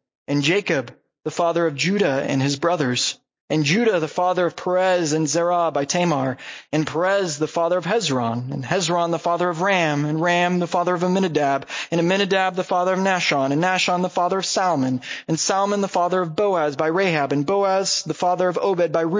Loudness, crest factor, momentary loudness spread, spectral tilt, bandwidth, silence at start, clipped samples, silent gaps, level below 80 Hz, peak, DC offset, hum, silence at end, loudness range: -21 LUFS; 18 dB; 5 LU; -4.5 dB/octave; 7.8 kHz; 0.3 s; under 0.1%; 3.40-3.48 s; -66 dBFS; -2 dBFS; under 0.1%; none; 0 s; 1 LU